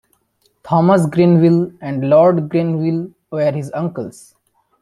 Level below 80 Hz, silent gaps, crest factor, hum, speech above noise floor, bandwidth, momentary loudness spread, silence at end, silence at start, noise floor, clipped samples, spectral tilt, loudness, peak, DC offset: -58 dBFS; none; 14 dB; none; 48 dB; 11.5 kHz; 12 LU; 0.7 s; 0.65 s; -62 dBFS; under 0.1%; -8.5 dB/octave; -15 LUFS; -2 dBFS; under 0.1%